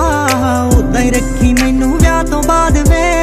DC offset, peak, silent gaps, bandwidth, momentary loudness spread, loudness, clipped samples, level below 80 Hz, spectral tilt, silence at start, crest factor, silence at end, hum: under 0.1%; 0 dBFS; none; 15.5 kHz; 2 LU; -12 LUFS; under 0.1%; -16 dBFS; -5.5 dB/octave; 0 s; 10 dB; 0 s; none